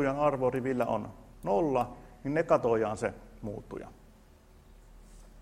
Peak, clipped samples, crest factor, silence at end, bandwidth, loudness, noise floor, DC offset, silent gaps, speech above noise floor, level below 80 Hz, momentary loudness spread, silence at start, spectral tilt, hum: -12 dBFS; under 0.1%; 20 dB; 0 s; 15 kHz; -31 LUFS; -57 dBFS; under 0.1%; none; 27 dB; -54 dBFS; 17 LU; 0 s; -7 dB/octave; none